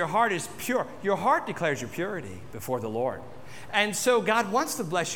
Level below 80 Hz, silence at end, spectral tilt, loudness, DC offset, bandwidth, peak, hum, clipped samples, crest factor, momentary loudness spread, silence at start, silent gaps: -62 dBFS; 0 s; -3.5 dB/octave; -27 LUFS; 0.5%; 19 kHz; -10 dBFS; none; under 0.1%; 18 dB; 14 LU; 0 s; none